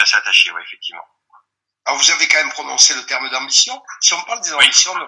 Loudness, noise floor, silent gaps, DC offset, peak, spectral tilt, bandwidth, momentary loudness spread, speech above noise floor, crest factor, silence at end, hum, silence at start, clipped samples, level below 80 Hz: -13 LUFS; -56 dBFS; none; under 0.1%; 0 dBFS; 3.5 dB/octave; 12 kHz; 16 LU; 40 dB; 16 dB; 0 s; none; 0 s; 0.1%; -68 dBFS